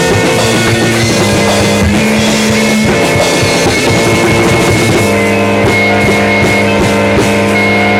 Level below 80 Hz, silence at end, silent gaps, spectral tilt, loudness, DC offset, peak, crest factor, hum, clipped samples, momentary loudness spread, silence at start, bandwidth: -30 dBFS; 0 s; none; -4.5 dB/octave; -8 LUFS; under 0.1%; -2 dBFS; 8 dB; none; under 0.1%; 1 LU; 0 s; 17 kHz